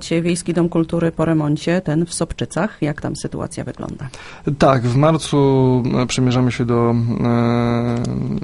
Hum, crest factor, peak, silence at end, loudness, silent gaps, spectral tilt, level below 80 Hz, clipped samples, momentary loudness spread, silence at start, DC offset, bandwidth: none; 18 dB; 0 dBFS; 0 s; -18 LUFS; none; -6.5 dB/octave; -40 dBFS; under 0.1%; 11 LU; 0 s; under 0.1%; 11.5 kHz